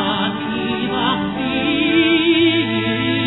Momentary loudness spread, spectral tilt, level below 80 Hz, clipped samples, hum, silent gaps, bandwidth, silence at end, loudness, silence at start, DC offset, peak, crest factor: 7 LU; -8 dB/octave; -48 dBFS; under 0.1%; none; none; 4.1 kHz; 0 s; -17 LUFS; 0 s; 0.2%; -6 dBFS; 12 dB